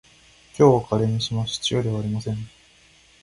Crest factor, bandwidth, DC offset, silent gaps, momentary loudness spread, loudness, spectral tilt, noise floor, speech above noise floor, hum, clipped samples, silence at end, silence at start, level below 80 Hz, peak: 20 dB; 11.5 kHz; under 0.1%; none; 15 LU; -22 LUFS; -6 dB/octave; -55 dBFS; 33 dB; none; under 0.1%; 0.75 s; 0.55 s; -50 dBFS; -2 dBFS